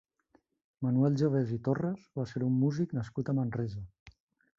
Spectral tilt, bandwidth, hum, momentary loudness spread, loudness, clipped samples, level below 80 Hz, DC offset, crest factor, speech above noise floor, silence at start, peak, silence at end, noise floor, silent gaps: -9 dB/octave; 7.4 kHz; none; 10 LU; -32 LUFS; under 0.1%; -62 dBFS; under 0.1%; 16 dB; 40 dB; 0.8 s; -16 dBFS; 0.5 s; -70 dBFS; 4.00-4.06 s